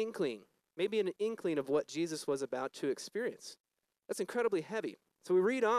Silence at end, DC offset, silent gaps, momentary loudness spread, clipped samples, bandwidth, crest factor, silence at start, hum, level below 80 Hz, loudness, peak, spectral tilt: 0 s; under 0.1%; 3.60-3.64 s; 13 LU; under 0.1%; 13.5 kHz; 16 dB; 0 s; none; -90 dBFS; -36 LUFS; -20 dBFS; -4.5 dB/octave